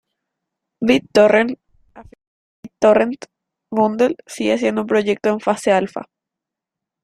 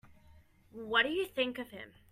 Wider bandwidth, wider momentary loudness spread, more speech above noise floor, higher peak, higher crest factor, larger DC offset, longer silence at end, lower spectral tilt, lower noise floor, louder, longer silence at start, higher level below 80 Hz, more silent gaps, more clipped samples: second, 13 kHz vs 15.5 kHz; second, 11 LU vs 20 LU; first, 68 dB vs 26 dB; first, -2 dBFS vs -14 dBFS; about the same, 18 dB vs 22 dB; neither; first, 1 s vs 0.2 s; first, -5 dB/octave vs -3.5 dB/octave; first, -84 dBFS vs -61 dBFS; first, -17 LUFS vs -32 LUFS; first, 0.8 s vs 0.05 s; first, -58 dBFS vs -68 dBFS; first, 2.27-2.63 s vs none; neither